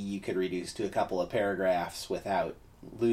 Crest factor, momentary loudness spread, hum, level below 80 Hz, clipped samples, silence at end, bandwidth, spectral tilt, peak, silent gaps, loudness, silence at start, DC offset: 14 dB; 7 LU; none; -58 dBFS; under 0.1%; 0 s; 15.5 kHz; -5.5 dB/octave; -16 dBFS; none; -32 LUFS; 0 s; under 0.1%